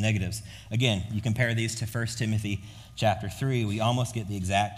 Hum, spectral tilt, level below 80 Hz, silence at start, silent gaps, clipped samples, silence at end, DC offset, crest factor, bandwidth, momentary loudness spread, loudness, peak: none; -5 dB/octave; -52 dBFS; 0 s; none; under 0.1%; 0 s; under 0.1%; 18 dB; 15.5 kHz; 8 LU; -28 LUFS; -10 dBFS